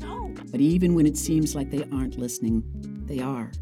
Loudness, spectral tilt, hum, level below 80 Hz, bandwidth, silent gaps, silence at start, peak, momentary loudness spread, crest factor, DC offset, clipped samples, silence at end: -25 LUFS; -6.5 dB/octave; none; -38 dBFS; 16.5 kHz; none; 0 s; -12 dBFS; 14 LU; 14 dB; under 0.1%; under 0.1%; 0 s